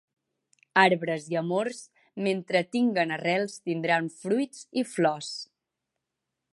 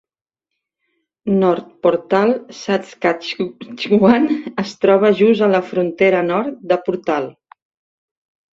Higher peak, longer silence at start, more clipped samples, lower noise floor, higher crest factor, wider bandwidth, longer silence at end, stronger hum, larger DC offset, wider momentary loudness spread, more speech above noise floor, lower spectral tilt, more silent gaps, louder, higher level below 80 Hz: about the same, -4 dBFS vs -2 dBFS; second, 0.75 s vs 1.25 s; neither; about the same, -85 dBFS vs -83 dBFS; first, 24 dB vs 16 dB; first, 11.5 kHz vs 7.6 kHz; second, 1.1 s vs 1.25 s; neither; neither; about the same, 12 LU vs 11 LU; second, 58 dB vs 67 dB; second, -5 dB/octave vs -7 dB/octave; neither; second, -27 LUFS vs -17 LUFS; second, -80 dBFS vs -60 dBFS